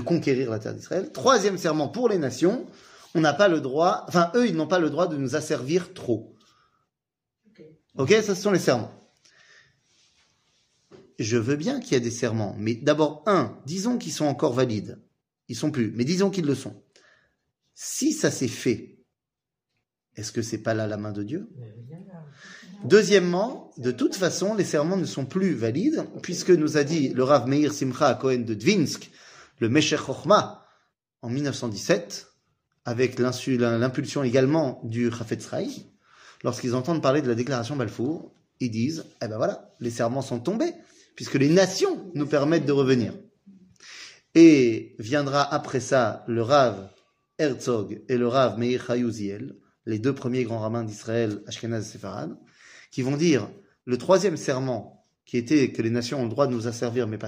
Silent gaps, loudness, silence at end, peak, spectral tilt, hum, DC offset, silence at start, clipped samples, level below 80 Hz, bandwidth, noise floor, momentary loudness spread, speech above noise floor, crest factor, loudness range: none; -24 LUFS; 0 s; -4 dBFS; -5.5 dB/octave; none; under 0.1%; 0 s; under 0.1%; -66 dBFS; 15.5 kHz; -88 dBFS; 14 LU; 64 dB; 22 dB; 8 LU